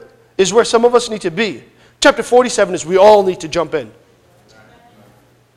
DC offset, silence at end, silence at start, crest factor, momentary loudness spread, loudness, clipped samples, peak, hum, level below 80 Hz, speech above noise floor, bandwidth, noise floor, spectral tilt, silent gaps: under 0.1%; 1.7 s; 0.4 s; 14 dB; 12 LU; -13 LUFS; 0.2%; 0 dBFS; none; -48 dBFS; 37 dB; 13 kHz; -50 dBFS; -3.5 dB/octave; none